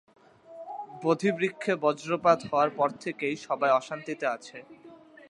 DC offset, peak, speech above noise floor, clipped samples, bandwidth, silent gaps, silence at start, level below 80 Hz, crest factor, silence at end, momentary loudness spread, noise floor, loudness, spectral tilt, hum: under 0.1%; -8 dBFS; 20 dB; under 0.1%; 11 kHz; none; 0.5 s; -74 dBFS; 22 dB; 0.35 s; 16 LU; -48 dBFS; -28 LUFS; -5.5 dB/octave; none